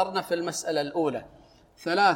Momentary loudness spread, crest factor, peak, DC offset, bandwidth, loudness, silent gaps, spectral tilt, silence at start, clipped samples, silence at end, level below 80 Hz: 9 LU; 18 dB; -8 dBFS; under 0.1%; 17 kHz; -28 LUFS; none; -3.5 dB/octave; 0 s; under 0.1%; 0 s; -64 dBFS